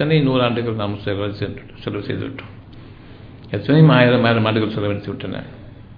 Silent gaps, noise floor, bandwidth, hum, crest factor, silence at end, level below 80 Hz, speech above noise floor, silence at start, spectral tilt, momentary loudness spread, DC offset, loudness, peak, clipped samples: none; -39 dBFS; 5 kHz; none; 18 dB; 0 s; -46 dBFS; 21 dB; 0 s; -10 dB/octave; 18 LU; under 0.1%; -18 LUFS; 0 dBFS; under 0.1%